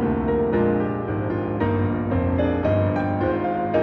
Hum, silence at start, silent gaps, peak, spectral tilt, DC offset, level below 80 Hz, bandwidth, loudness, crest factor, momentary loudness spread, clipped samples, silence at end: none; 0 s; none; -8 dBFS; -10.5 dB/octave; under 0.1%; -38 dBFS; 4.8 kHz; -22 LUFS; 14 dB; 4 LU; under 0.1%; 0 s